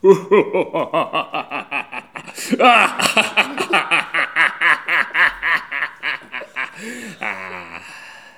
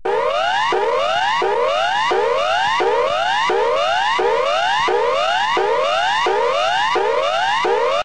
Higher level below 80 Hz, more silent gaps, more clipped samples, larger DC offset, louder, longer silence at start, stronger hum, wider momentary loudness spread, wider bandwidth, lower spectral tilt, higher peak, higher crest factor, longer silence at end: second, -60 dBFS vs -52 dBFS; neither; neither; second, 0.1% vs 1%; about the same, -17 LUFS vs -17 LUFS; about the same, 0.05 s vs 0.05 s; neither; first, 18 LU vs 1 LU; first, 18.5 kHz vs 10 kHz; about the same, -3 dB/octave vs -2 dB/octave; first, 0 dBFS vs -6 dBFS; first, 18 dB vs 12 dB; first, 0.15 s vs 0 s